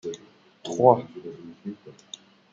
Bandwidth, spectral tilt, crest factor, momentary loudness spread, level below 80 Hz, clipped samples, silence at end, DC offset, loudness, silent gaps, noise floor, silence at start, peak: 7.8 kHz; -6.5 dB/octave; 24 dB; 24 LU; -74 dBFS; under 0.1%; 0.6 s; under 0.1%; -22 LUFS; none; -54 dBFS; 0.05 s; -2 dBFS